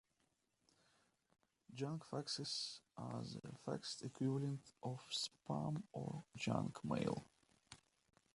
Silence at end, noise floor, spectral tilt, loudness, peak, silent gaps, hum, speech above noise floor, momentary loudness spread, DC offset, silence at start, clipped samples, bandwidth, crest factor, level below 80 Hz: 0.6 s; -84 dBFS; -5 dB/octave; -45 LUFS; -24 dBFS; none; none; 39 dB; 9 LU; under 0.1%; 1.7 s; under 0.1%; 11.5 kHz; 24 dB; -78 dBFS